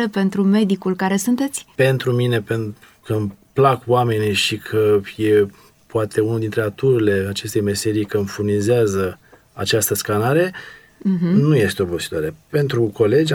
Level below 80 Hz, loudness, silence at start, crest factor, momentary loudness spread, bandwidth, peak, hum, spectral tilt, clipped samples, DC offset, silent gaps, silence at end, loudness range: -54 dBFS; -19 LUFS; 0 s; 16 dB; 8 LU; 18 kHz; -2 dBFS; none; -5.5 dB/octave; under 0.1%; under 0.1%; none; 0 s; 1 LU